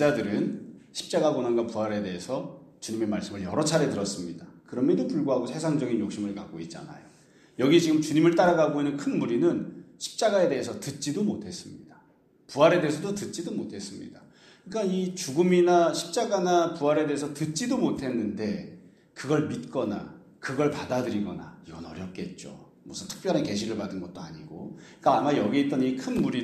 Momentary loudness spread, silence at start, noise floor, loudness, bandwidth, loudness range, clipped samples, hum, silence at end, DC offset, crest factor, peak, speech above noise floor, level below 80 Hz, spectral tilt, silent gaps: 19 LU; 0 s; -61 dBFS; -27 LUFS; 13.5 kHz; 7 LU; under 0.1%; none; 0 s; under 0.1%; 20 dB; -6 dBFS; 34 dB; -64 dBFS; -5.5 dB/octave; none